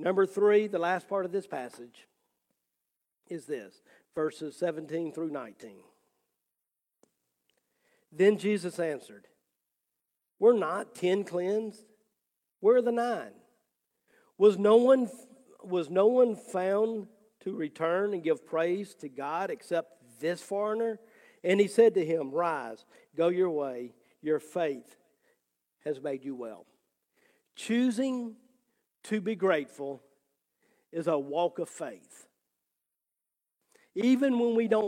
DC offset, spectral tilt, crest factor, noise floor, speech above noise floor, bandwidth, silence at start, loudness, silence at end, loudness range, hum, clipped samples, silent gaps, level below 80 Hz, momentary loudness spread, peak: under 0.1%; -6 dB/octave; 20 dB; -88 dBFS; 60 dB; 14.5 kHz; 0 s; -29 LUFS; 0 s; 11 LU; none; under 0.1%; none; -86 dBFS; 17 LU; -10 dBFS